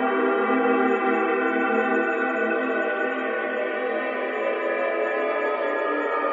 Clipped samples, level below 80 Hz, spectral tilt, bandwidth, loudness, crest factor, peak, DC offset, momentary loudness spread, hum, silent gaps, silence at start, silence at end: under 0.1%; -82 dBFS; -6 dB/octave; 7.4 kHz; -23 LUFS; 14 dB; -10 dBFS; under 0.1%; 5 LU; none; none; 0 s; 0 s